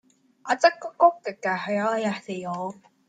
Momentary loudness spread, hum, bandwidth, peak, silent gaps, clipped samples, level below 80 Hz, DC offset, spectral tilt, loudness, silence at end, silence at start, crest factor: 12 LU; none; 9.2 kHz; -4 dBFS; none; under 0.1%; -76 dBFS; under 0.1%; -4.5 dB/octave; -25 LUFS; 0.35 s; 0.45 s; 22 dB